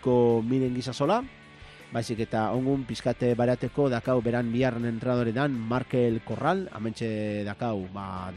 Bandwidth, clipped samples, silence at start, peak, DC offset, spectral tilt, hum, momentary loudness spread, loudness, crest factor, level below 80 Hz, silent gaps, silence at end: 11.5 kHz; under 0.1%; 0 s; -12 dBFS; under 0.1%; -7.5 dB/octave; none; 8 LU; -28 LUFS; 16 dB; -54 dBFS; none; 0 s